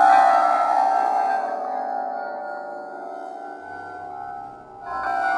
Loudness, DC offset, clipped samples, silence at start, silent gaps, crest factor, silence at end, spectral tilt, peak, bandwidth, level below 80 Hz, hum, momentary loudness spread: -21 LUFS; under 0.1%; under 0.1%; 0 s; none; 18 dB; 0 s; -3.5 dB/octave; -4 dBFS; 10.5 kHz; -66 dBFS; none; 18 LU